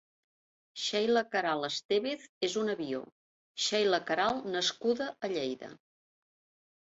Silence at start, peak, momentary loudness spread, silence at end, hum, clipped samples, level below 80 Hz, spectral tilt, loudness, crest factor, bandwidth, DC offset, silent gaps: 0.75 s; -16 dBFS; 9 LU; 1.1 s; none; under 0.1%; -76 dBFS; -3 dB/octave; -32 LUFS; 18 dB; 8 kHz; under 0.1%; 1.85-1.89 s, 2.29-2.41 s, 3.12-3.55 s